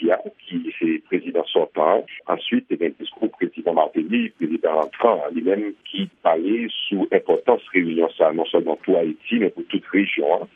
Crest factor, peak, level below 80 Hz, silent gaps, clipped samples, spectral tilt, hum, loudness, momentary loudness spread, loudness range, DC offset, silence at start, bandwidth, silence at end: 20 dB; -2 dBFS; -74 dBFS; none; under 0.1%; -8 dB/octave; none; -21 LUFS; 7 LU; 2 LU; under 0.1%; 0 s; 3.8 kHz; 0.1 s